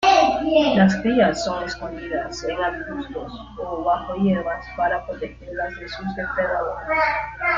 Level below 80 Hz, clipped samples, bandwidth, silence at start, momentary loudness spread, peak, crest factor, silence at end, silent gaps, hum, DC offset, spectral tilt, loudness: -44 dBFS; under 0.1%; 7.6 kHz; 0 s; 13 LU; -2 dBFS; 18 dB; 0 s; none; none; under 0.1%; -5.5 dB/octave; -22 LUFS